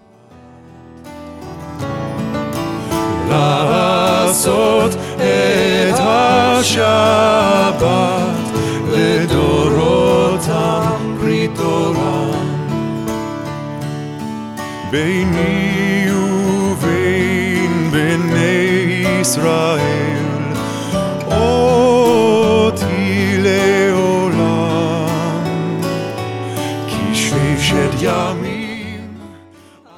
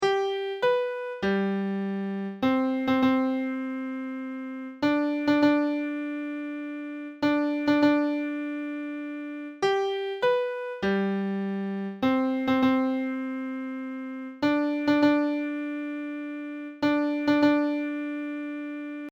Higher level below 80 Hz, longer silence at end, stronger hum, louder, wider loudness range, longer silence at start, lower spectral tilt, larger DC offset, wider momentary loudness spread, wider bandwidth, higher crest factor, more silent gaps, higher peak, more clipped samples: first, -40 dBFS vs -66 dBFS; first, 0.6 s vs 0 s; neither; first, -15 LUFS vs -27 LUFS; first, 6 LU vs 2 LU; first, 0.45 s vs 0 s; second, -5 dB/octave vs -6.5 dB/octave; neither; about the same, 12 LU vs 12 LU; first, 16.5 kHz vs 7.4 kHz; about the same, 14 dB vs 16 dB; neither; first, -2 dBFS vs -10 dBFS; neither